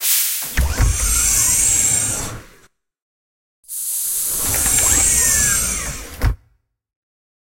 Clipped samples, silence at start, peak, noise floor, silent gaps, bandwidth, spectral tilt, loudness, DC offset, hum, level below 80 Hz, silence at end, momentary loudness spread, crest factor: under 0.1%; 0 s; -2 dBFS; -61 dBFS; 3.02-3.63 s; 16.5 kHz; -1.5 dB/octave; -15 LUFS; under 0.1%; none; -28 dBFS; 1.05 s; 12 LU; 18 dB